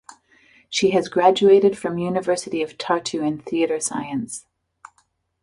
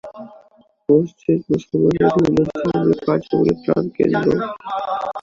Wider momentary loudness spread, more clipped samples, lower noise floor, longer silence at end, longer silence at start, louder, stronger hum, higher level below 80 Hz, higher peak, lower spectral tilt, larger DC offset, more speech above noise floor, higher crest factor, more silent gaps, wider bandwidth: first, 12 LU vs 9 LU; neither; first, -66 dBFS vs -53 dBFS; first, 1 s vs 0 s; about the same, 0.1 s vs 0.05 s; about the same, -20 LUFS vs -18 LUFS; neither; second, -62 dBFS vs -48 dBFS; about the same, -2 dBFS vs -2 dBFS; second, -4.5 dB/octave vs -8.5 dB/octave; neither; first, 46 dB vs 36 dB; about the same, 20 dB vs 16 dB; neither; first, 11.5 kHz vs 7.6 kHz